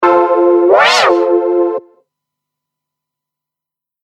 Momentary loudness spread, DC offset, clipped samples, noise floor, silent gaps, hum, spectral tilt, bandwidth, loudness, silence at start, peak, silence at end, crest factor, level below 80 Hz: 8 LU; under 0.1%; under 0.1%; -85 dBFS; none; none; -2.5 dB/octave; 11 kHz; -10 LUFS; 0 s; 0 dBFS; 2.25 s; 14 dB; -66 dBFS